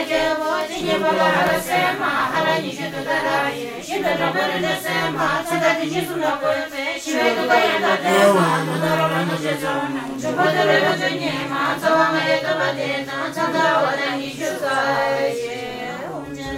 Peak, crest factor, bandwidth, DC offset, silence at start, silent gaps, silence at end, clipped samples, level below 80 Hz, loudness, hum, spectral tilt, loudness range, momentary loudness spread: -2 dBFS; 18 dB; 16 kHz; under 0.1%; 0 s; none; 0 s; under 0.1%; -54 dBFS; -20 LUFS; none; -4 dB/octave; 3 LU; 9 LU